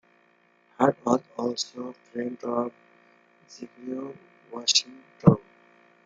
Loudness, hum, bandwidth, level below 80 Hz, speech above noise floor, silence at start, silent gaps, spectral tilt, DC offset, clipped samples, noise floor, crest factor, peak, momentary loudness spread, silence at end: -26 LUFS; none; 9.4 kHz; -60 dBFS; 36 dB; 0.8 s; none; -4.5 dB/octave; under 0.1%; under 0.1%; -63 dBFS; 26 dB; -2 dBFS; 20 LU; 0.65 s